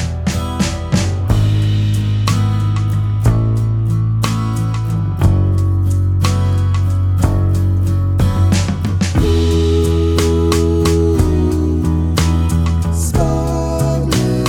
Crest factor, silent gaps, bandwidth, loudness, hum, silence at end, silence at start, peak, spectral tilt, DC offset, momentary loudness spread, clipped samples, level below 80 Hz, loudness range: 14 dB; none; 15.5 kHz; -15 LUFS; none; 0 s; 0 s; 0 dBFS; -6.5 dB/octave; under 0.1%; 4 LU; under 0.1%; -22 dBFS; 2 LU